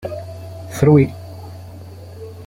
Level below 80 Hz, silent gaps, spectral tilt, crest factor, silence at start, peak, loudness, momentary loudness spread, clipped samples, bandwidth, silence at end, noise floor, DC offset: -48 dBFS; none; -8 dB/octave; 18 dB; 0.05 s; -2 dBFS; -15 LUFS; 24 LU; under 0.1%; 15.5 kHz; 0.05 s; -35 dBFS; under 0.1%